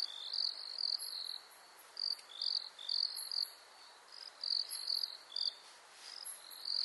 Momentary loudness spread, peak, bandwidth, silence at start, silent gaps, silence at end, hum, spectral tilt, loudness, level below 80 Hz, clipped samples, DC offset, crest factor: 19 LU; -22 dBFS; 11.5 kHz; 0 s; none; 0 s; none; 3.5 dB/octave; -38 LUFS; under -90 dBFS; under 0.1%; under 0.1%; 20 dB